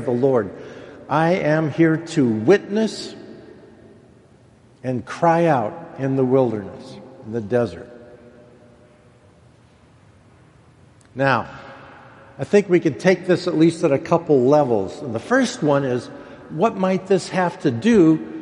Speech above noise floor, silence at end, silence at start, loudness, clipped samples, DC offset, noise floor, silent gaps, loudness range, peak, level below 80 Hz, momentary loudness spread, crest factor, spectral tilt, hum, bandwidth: 33 dB; 0 s; 0 s; -19 LUFS; under 0.1%; under 0.1%; -51 dBFS; none; 10 LU; -2 dBFS; -58 dBFS; 21 LU; 20 dB; -6.5 dB/octave; none; 11 kHz